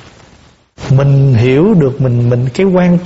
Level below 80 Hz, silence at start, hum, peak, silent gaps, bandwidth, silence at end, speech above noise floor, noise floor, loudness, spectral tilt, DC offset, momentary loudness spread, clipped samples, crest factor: -38 dBFS; 0.8 s; none; 0 dBFS; none; 8 kHz; 0 s; 35 dB; -44 dBFS; -10 LUFS; -8.5 dB/octave; under 0.1%; 4 LU; under 0.1%; 10 dB